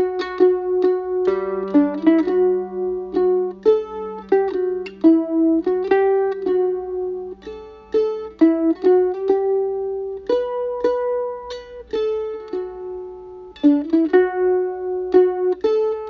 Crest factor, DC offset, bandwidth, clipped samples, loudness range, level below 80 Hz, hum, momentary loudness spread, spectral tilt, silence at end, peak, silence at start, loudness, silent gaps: 16 dB; under 0.1%; 6.2 kHz; under 0.1%; 5 LU; -54 dBFS; none; 13 LU; -7.5 dB/octave; 0 s; -4 dBFS; 0 s; -19 LUFS; none